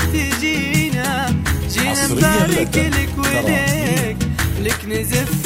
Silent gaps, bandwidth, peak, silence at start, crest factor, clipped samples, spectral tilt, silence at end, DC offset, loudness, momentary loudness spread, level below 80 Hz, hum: none; 16.5 kHz; -2 dBFS; 0 s; 16 dB; under 0.1%; -4.5 dB/octave; 0 s; under 0.1%; -17 LUFS; 5 LU; -28 dBFS; none